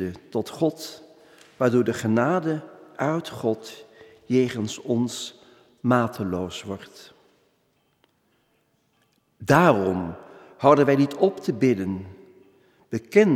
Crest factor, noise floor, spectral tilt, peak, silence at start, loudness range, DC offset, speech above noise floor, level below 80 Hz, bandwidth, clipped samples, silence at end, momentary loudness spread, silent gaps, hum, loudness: 22 dB; -68 dBFS; -6.5 dB/octave; -4 dBFS; 0 s; 8 LU; under 0.1%; 45 dB; -62 dBFS; 16 kHz; under 0.1%; 0 s; 19 LU; none; none; -23 LUFS